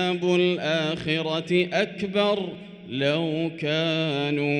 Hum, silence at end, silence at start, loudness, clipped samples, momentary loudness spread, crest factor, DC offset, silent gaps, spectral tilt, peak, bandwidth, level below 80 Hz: none; 0 s; 0 s; -24 LUFS; under 0.1%; 5 LU; 16 dB; under 0.1%; none; -6 dB/octave; -8 dBFS; 10.5 kHz; -64 dBFS